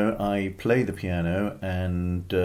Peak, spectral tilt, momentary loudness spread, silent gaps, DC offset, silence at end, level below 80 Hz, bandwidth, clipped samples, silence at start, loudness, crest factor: -10 dBFS; -7.5 dB/octave; 5 LU; none; under 0.1%; 0 s; -40 dBFS; 16 kHz; under 0.1%; 0 s; -27 LUFS; 16 dB